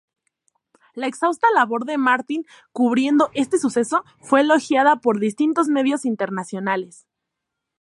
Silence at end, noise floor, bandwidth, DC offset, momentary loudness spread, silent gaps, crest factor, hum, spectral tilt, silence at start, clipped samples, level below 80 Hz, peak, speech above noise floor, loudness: 0.95 s; -81 dBFS; 11.5 kHz; under 0.1%; 11 LU; none; 18 dB; none; -4.5 dB/octave; 0.95 s; under 0.1%; -72 dBFS; -2 dBFS; 62 dB; -20 LUFS